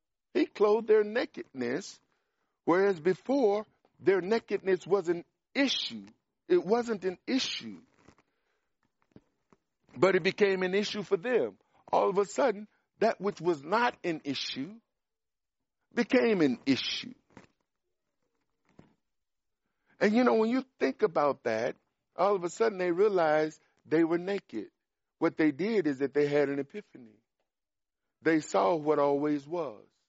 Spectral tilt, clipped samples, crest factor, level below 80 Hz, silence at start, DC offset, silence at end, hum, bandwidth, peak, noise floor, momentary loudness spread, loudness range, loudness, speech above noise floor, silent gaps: -3.5 dB/octave; under 0.1%; 20 dB; -78 dBFS; 0.35 s; under 0.1%; 0.3 s; none; 8 kHz; -10 dBFS; under -90 dBFS; 11 LU; 4 LU; -29 LUFS; over 61 dB; none